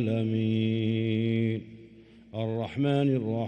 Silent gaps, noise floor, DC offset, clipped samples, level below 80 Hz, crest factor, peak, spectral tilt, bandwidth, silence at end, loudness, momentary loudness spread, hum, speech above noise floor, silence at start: none; -52 dBFS; under 0.1%; under 0.1%; -66 dBFS; 14 dB; -14 dBFS; -9 dB/octave; 5.8 kHz; 0 s; -28 LUFS; 9 LU; none; 25 dB; 0 s